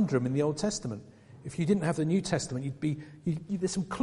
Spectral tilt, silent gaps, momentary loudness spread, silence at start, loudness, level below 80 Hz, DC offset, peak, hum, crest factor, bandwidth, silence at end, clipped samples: -6 dB/octave; none; 10 LU; 0 s; -31 LUFS; -58 dBFS; under 0.1%; -14 dBFS; none; 16 dB; 11.5 kHz; 0 s; under 0.1%